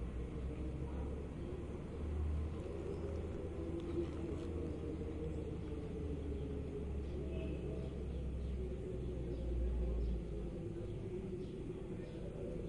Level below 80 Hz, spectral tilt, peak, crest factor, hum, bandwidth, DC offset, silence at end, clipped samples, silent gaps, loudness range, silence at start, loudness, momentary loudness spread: -46 dBFS; -8.5 dB/octave; -28 dBFS; 14 dB; none; 10.5 kHz; under 0.1%; 0 s; under 0.1%; none; 1 LU; 0 s; -44 LUFS; 5 LU